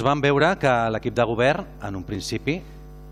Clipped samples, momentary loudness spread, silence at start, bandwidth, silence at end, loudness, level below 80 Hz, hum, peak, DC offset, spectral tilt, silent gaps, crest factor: under 0.1%; 12 LU; 0 s; 14.5 kHz; 0 s; -22 LUFS; -44 dBFS; none; -6 dBFS; under 0.1%; -5.5 dB/octave; none; 16 dB